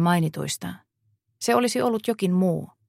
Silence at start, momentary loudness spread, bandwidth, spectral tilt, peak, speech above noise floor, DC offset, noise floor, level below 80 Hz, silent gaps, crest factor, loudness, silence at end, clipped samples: 0 s; 9 LU; 16 kHz; -5.5 dB/octave; -6 dBFS; 47 dB; under 0.1%; -70 dBFS; -64 dBFS; none; 18 dB; -24 LUFS; 0.2 s; under 0.1%